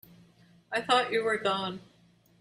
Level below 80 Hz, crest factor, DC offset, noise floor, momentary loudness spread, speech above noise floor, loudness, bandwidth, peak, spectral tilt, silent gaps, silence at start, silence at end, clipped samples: -72 dBFS; 22 dB; under 0.1%; -63 dBFS; 11 LU; 34 dB; -29 LUFS; 15.5 kHz; -10 dBFS; -3.5 dB/octave; none; 0.7 s; 0.6 s; under 0.1%